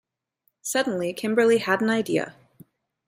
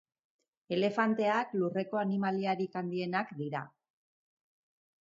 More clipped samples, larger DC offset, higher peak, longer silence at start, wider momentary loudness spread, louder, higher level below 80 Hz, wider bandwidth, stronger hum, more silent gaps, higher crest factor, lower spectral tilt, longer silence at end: neither; neither; first, -6 dBFS vs -14 dBFS; about the same, 0.65 s vs 0.7 s; about the same, 8 LU vs 9 LU; first, -23 LUFS vs -33 LUFS; first, -72 dBFS vs -82 dBFS; first, 16 kHz vs 7.6 kHz; neither; neither; about the same, 20 dB vs 20 dB; second, -4 dB/octave vs -7.5 dB/octave; second, 0.75 s vs 1.35 s